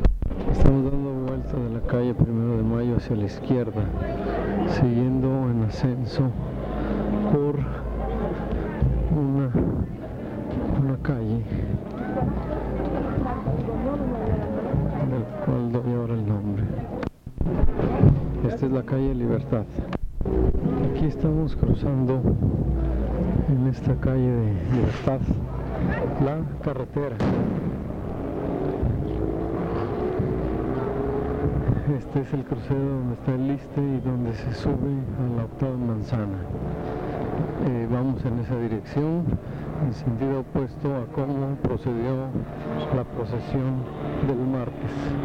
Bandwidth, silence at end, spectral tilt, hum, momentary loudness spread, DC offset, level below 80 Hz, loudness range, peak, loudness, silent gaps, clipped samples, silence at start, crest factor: 6.8 kHz; 0 s; -10 dB/octave; none; 7 LU; under 0.1%; -32 dBFS; 3 LU; 0 dBFS; -26 LUFS; none; under 0.1%; 0 s; 24 dB